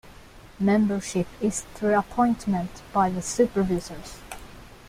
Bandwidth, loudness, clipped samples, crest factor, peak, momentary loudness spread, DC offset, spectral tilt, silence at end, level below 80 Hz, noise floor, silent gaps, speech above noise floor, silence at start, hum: 15.5 kHz; -25 LUFS; under 0.1%; 18 dB; -8 dBFS; 18 LU; under 0.1%; -5.5 dB/octave; 0 s; -48 dBFS; -47 dBFS; none; 23 dB; 0.05 s; none